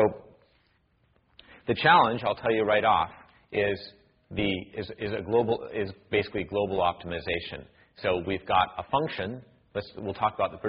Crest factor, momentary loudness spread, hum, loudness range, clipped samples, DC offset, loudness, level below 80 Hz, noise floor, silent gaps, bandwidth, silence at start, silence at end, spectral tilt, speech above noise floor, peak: 20 dB; 15 LU; none; 5 LU; under 0.1%; under 0.1%; -28 LUFS; -56 dBFS; -68 dBFS; none; 5.2 kHz; 0 s; 0 s; -3 dB/octave; 40 dB; -8 dBFS